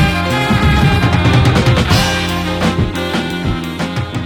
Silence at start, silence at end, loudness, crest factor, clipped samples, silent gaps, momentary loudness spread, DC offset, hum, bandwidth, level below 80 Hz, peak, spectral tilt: 0 s; 0 s; -14 LUFS; 12 dB; under 0.1%; none; 8 LU; under 0.1%; none; 19 kHz; -24 dBFS; 0 dBFS; -5.5 dB/octave